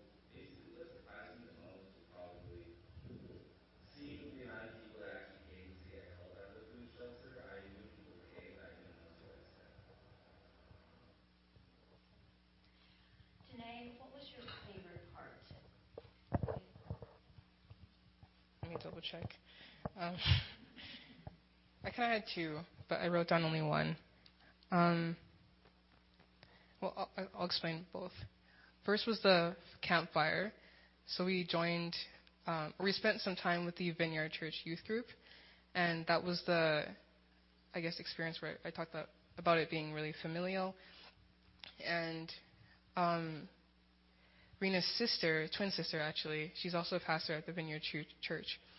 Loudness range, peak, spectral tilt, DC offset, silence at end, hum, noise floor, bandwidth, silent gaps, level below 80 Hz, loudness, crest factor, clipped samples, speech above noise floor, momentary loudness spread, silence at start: 20 LU; -16 dBFS; -3.5 dB/octave; under 0.1%; 0 s; none; -70 dBFS; 5.8 kHz; none; -64 dBFS; -39 LUFS; 26 dB; under 0.1%; 32 dB; 24 LU; 0 s